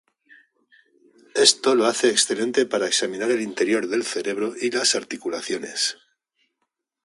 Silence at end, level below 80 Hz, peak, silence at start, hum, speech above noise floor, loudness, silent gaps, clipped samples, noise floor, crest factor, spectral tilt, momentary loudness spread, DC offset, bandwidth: 1.1 s; -72 dBFS; -2 dBFS; 1.35 s; none; 56 dB; -21 LUFS; none; under 0.1%; -78 dBFS; 22 dB; -1.5 dB/octave; 11 LU; under 0.1%; 11.5 kHz